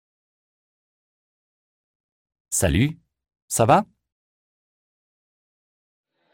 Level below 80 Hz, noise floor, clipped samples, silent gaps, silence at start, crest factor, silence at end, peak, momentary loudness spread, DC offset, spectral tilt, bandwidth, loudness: -44 dBFS; under -90 dBFS; under 0.1%; 3.42-3.48 s; 2.5 s; 24 dB; 2.5 s; -4 dBFS; 9 LU; under 0.1%; -5 dB/octave; 16 kHz; -21 LUFS